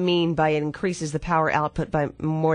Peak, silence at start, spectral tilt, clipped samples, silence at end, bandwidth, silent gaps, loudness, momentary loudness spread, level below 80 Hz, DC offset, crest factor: -8 dBFS; 0 s; -6 dB/octave; under 0.1%; 0 s; 10 kHz; none; -24 LUFS; 6 LU; -46 dBFS; under 0.1%; 16 dB